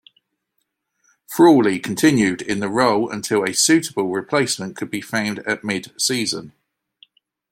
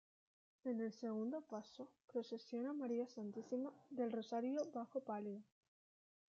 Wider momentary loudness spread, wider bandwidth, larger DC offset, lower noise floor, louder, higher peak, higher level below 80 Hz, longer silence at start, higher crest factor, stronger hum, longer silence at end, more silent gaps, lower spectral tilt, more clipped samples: about the same, 10 LU vs 8 LU; first, 16.5 kHz vs 7.4 kHz; neither; second, -74 dBFS vs under -90 dBFS; first, -19 LUFS vs -46 LUFS; first, -2 dBFS vs -32 dBFS; first, -60 dBFS vs under -90 dBFS; first, 1.3 s vs 0.65 s; about the same, 18 dB vs 14 dB; neither; about the same, 1 s vs 0.95 s; second, none vs 2.04-2.08 s; second, -3.5 dB/octave vs -6 dB/octave; neither